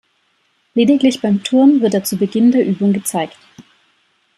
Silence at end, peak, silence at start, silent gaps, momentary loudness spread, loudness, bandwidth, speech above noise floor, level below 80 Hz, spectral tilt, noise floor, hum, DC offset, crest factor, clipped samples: 0.75 s; -2 dBFS; 0.75 s; none; 10 LU; -14 LUFS; 14 kHz; 48 dB; -62 dBFS; -5.5 dB/octave; -62 dBFS; none; under 0.1%; 14 dB; under 0.1%